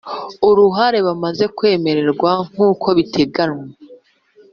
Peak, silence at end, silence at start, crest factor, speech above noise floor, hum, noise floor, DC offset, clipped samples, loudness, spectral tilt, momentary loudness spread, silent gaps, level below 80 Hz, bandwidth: -2 dBFS; 0.6 s; 0.05 s; 14 dB; 35 dB; none; -50 dBFS; under 0.1%; under 0.1%; -15 LUFS; -4.5 dB/octave; 8 LU; none; -54 dBFS; 6.8 kHz